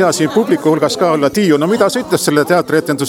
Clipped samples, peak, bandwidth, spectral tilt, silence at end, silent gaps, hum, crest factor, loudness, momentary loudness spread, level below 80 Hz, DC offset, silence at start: under 0.1%; 0 dBFS; 17.5 kHz; -5 dB/octave; 0 s; none; none; 12 dB; -13 LUFS; 2 LU; -54 dBFS; under 0.1%; 0 s